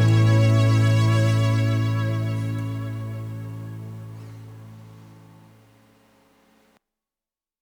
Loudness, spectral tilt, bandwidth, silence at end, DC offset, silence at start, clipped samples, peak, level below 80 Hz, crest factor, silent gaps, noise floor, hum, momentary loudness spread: -21 LUFS; -7 dB/octave; 10.5 kHz; 2.6 s; under 0.1%; 0 s; under 0.1%; -8 dBFS; -50 dBFS; 14 dB; none; under -90 dBFS; none; 23 LU